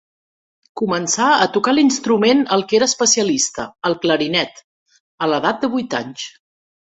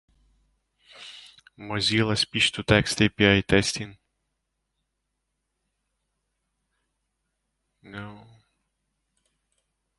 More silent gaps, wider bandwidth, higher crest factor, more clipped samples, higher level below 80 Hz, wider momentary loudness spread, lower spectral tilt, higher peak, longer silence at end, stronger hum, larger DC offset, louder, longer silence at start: first, 4.64-4.86 s, 5.00-5.18 s vs none; second, 8.4 kHz vs 11.5 kHz; second, 16 dB vs 26 dB; neither; second, -60 dBFS vs -50 dBFS; second, 10 LU vs 23 LU; second, -2.5 dB/octave vs -4 dB/octave; about the same, -2 dBFS vs -2 dBFS; second, 0.55 s vs 1.8 s; neither; neither; first, -17 LUFS vs -22 LUFS; second, 0.75 s vs 1 s